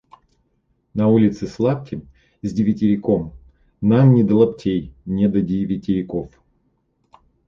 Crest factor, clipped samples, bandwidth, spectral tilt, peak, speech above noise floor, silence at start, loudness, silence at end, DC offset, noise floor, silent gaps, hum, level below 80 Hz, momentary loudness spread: 16 dB; under 0.1%; 7.2 kHz; -9.5 dB/octave; -2 dBFS; 48 dB; 0.95 s; -19 LUFS; 1.2 s; under 0.1%; -66 dBFS; none; none; -48 dBFS; 16 LU